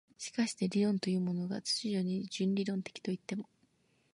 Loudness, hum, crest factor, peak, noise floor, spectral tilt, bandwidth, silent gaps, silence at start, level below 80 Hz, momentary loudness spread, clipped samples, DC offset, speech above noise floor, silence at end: -35 LUFS; none; 16 dB; -20 dBFS; -72 dBFS; -5.5 dB/octave; 11.5 kHz; none; 0.2 s; -78 dBFS; 9 LU; under 0.1%; under 0.1%; 38 dB; 0.7 s